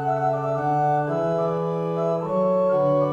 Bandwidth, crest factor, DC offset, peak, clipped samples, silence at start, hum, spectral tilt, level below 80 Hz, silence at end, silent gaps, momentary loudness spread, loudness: 7.4 kHz; 12 dB; under 0.1%; -10 dBFS; under 0.1%; 0 s; none; -9 dB/octave; -60 dBFS; 0 s; none; 4 LU; -23 LUFS